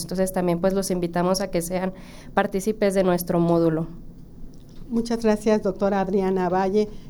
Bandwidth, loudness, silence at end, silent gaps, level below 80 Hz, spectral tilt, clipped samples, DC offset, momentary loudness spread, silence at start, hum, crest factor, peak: over 20 kHz; -23 LUFS; 0 s; none; -42 dBFS; -6 dB/octave; under 0.1%; under 0.1%; 7 LU; 0 s; none; 18 dB; -4 dBFS